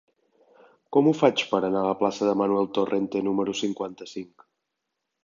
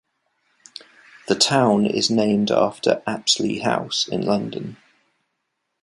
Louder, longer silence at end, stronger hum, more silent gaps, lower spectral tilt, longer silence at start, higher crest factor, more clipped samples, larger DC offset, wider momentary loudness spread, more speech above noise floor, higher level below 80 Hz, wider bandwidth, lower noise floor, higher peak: second, -24 LUFS vs -20 LUFS; about the same, 1 s vs 1.1 s; neither; neither; first, -5.5 dB/octave vs -4 dB/octave; second, 0.9 s vs 1.3 s; about the same, 22 dB vs 20 dB; neither; neither; second, 14 LU vs 23 LU; about the same, 58 dB vs 56 dB; second, -68 dBFS vs -62 dBFS; second, 7.6 kHz vs 11.5 kHz; first, -82 dBFS vs -76 dBFS; about the same, -4 dBFS vs -2 dBFS